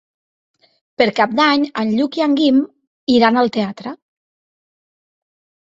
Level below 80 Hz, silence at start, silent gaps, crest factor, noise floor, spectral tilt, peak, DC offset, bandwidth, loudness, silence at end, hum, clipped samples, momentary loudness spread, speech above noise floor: -60 dBFS; 1 s; 2.87-3.07 s; 18 dB; under -90 dBFS; -5.5 dB/octave; 0 dBFS; under 0.1%; 7.8 kHz; -16 LUFS; 1.7 s; none; under 0.1%; 14 LU; over 75 dB